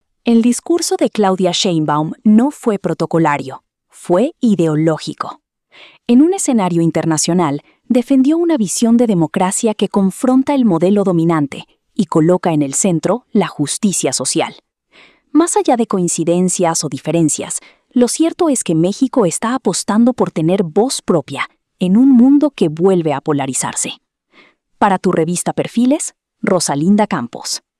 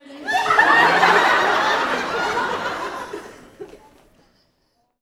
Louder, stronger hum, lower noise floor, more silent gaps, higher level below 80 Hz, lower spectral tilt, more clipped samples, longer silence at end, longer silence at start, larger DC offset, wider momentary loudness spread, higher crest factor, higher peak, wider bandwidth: first, -14 LUFS vs -17 LUFS; neither; second, -50 dBFS vs -67 dBFS; neither; about the same, -60 dBFS vs -56 dBFS; first, -5 dB/octave vs -2.5 dB/octave; neither; second, 0.2 s vs 1.25 s; first, 0.25 s vs 0.1 s; neither; second, 9 LU vs 16 LU; second, 14 dB vs 20 dB; about the same, -2 dBFS vs 0 dBFS; second, 12 kHz vs 17.5 kHz